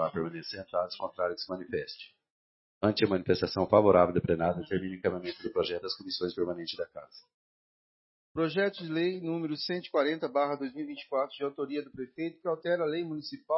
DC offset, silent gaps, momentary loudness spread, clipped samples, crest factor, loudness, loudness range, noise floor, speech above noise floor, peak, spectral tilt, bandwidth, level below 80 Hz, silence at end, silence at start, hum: under 0.1%; 2.30-2.81 s, 7.34-8.35 s; 11 LU; under 0.1%; 22 dB; -31 LUFS; 7 LU; under -90 dBFS; over 59 dB; -8 dBFS; -8.5 dB/octave; 6 kHz; -64 dBFS; 0 s; 0 s; none